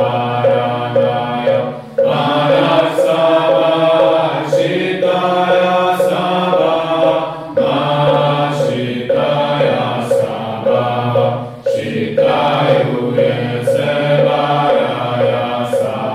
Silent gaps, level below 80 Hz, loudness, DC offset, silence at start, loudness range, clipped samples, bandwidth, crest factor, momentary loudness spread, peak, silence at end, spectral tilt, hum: none; -54 dBFS; -14 LUFS; under 0.1%; 0 s; 3 LU; under 0.1%; 13.5 kHz; 14 dB; 5 LU; 0 dBFS; 0 s; -6.5 dB/octave; none